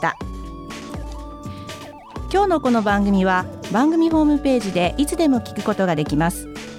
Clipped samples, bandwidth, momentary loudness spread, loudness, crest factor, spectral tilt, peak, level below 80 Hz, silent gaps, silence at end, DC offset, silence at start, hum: under 0.1%; 16 kHz; 17 LU; -19 LUFS; 14 dB; -6 dB/octave; -6 dBFS; -36 dBFS; none; 0 s; under 0.1%; 0 s; none